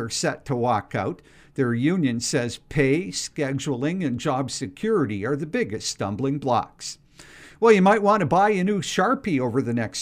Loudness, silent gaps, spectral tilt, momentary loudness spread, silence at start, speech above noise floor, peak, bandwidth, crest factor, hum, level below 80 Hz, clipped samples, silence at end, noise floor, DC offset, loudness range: -23 LUFS; none; -5 dB/octave; 10 LU; 0 s; 25 dB; -4 dBFS; 15.5 kHz; 20 dB; none; -54 dBFS; under 0.1%; 0 s; -47 dBFS; under 0.1%; 5 LU